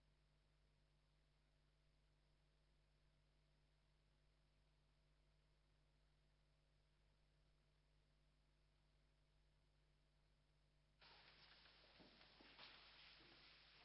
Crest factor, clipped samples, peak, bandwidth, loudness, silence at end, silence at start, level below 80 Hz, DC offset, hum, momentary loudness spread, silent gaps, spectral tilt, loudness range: 28 dB; under 0.1%; -48 dBFS; 5.6 kHz; -67 LUFS; 0 s; 0 s; -82 dBFS; under 0.1%; none; 6 LU; none; -1.5 dB/octave; 2 LU